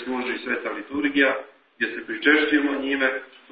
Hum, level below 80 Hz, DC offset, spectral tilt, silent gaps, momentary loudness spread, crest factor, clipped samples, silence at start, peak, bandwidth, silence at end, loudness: none; -66 dBFS; under 0.1%; -8 dB/octave; none; 10 LU; 20 dB; under 0.1%; 0 s; -4 dBFS; 5 kHz; 0.25 s; -23 LUFS